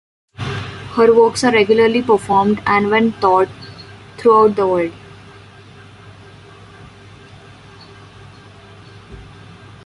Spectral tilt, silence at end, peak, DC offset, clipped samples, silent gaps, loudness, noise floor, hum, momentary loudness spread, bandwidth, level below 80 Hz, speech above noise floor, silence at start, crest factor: -5.5 dB/octave; 0.65 s; -2 dBFS; under 0.1%; under 0.1%; none; -14 LUFS; -41 dBFS; none; 16 LU; 11.5 kHz; -48 dBFS; 27 dB; 0.4 s; 16 dB